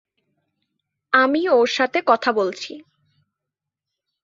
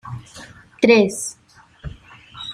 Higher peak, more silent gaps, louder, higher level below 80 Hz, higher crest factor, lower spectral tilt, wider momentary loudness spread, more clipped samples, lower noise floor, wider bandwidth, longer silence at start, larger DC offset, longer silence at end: about the same, -2 dBFS vs 0 dBFS; neither; about the same, -18 LUFS vs -17 LUFS; second, -70 dBFS vs -48 dBFS; about the same, 20 dB vs 20 dB; about the same, -3.5 dB/octave vs -4.5 dB/octave; second, 10 LU vs 25 LU; neither; first, -85 dBFS vs -42 dBFS; second, 7.6 kHz vs 15.5 kHz; first, 1.1 s vs 0.05 s; neither; first, 1.45 s vs 0 s